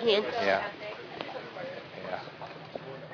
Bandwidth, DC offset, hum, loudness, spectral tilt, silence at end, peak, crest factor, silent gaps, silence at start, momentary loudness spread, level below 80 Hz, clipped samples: 5.4 kHz; under 0.1%; none; -34 LUFS; -5 dB/octave; 0 s; -12 dBFS; 22 dB; none; 0 s; 15 LU; -74 dBFS; under 0.1%